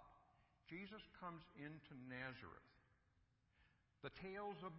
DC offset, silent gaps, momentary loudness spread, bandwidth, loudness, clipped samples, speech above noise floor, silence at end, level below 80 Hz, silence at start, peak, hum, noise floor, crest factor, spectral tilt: under 0.1%; none; 8 LU; 5.6 kHz; -55 LUFS; under 0.1%; 26 dB; 0 s; -78 dBFS; 0 s; -36 dBFS; none; -81 dBFS; 20 dB; -4 dB/octave